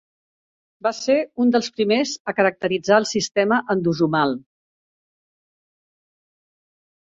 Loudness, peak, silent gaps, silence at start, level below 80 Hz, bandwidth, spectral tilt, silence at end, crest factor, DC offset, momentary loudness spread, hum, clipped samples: -20 LUFS; -2 dBFS; 2.20-2.25 s; 0.85 s; -66 dBFS; 7.8 kHz; -4.5 dB/octave; 2.65 s; 20 dB; under 0.1%; 6 LU; none; under 0.1%